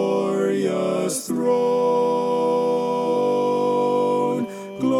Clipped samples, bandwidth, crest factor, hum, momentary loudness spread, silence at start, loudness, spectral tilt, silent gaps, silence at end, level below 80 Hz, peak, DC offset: under 0.1%; 15.5 kHz; 10 dB; none; 4 LU; 0 s; -21 LUFS; -5.5 dB/octave; none; 0 s; -72 dBFS; -10 dBFS; under 0.1%